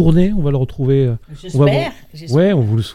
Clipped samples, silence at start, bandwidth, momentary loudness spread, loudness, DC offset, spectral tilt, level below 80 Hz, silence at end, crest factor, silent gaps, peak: under 0.1%; 0 s; 11 kHz; 10 LU; -16 LUFS; under 0.1%; -8.5 dB/octave; -30 dBFS; 0 s; 14 dB; none; 0 dBFS